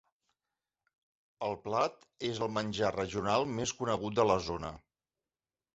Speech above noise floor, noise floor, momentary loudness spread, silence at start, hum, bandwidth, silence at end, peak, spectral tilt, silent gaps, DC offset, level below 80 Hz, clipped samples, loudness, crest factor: over 57 dB; under -90 dBFS; 10 LU; 1.4 s; none; 8 kHz; 0.95 s; -14 dBFS; -4 dB/octave; none; under 0.1%; -60 dBFS; under 0.1%; -33 LUFS; 22 dB